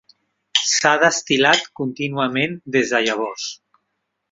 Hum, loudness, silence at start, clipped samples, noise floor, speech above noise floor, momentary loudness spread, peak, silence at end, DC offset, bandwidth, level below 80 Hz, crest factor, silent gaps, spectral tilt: none; -18 LUFS; 0.55 s; under 0.1%; -75 dBFS; 56 dB; 11 LU; -2 dBFS; 0.75 s; under 0.1%; 8 kHz; -64 dBFS; 20 dB; none; -2.5 dB/octave